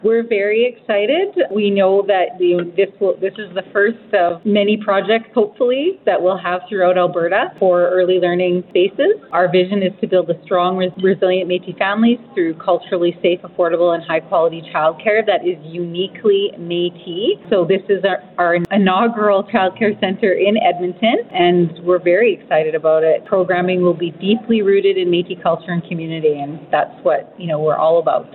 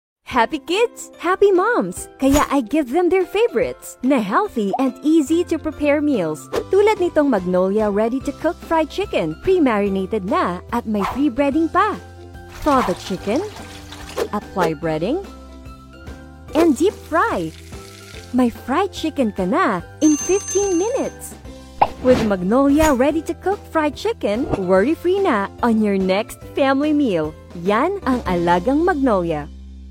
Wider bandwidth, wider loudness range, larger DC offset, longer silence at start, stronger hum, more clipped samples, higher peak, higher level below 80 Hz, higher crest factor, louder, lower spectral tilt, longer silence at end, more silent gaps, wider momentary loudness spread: second, 4.3 kHz vs 17 kHz; about the same, 2 LU vs 4 LU; neither; second, 0.05 s vs 0.3 s; neither; neither; about the same, 0 dBFS vs 0 dBFS; second, -64 dBFS vs -40 dBFS; about the same, 16 dB vs 18 dB; first, -16 LUFS vs -19 LUFS; first, -9.5 dB/octave vs -5 dB/octave; about the same, 0.1 s vs 0 s; neither; second, 6 LU vs 13 LU